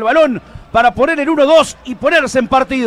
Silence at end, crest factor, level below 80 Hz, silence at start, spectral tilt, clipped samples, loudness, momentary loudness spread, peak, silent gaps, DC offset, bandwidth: 0 s; 12 dB; -40 dBFS; 0 s; -4 dB/octave; under 0.1%; -12 LUFS; 8 LU; 0 dBFS; none; under 0.1%; 13 kHz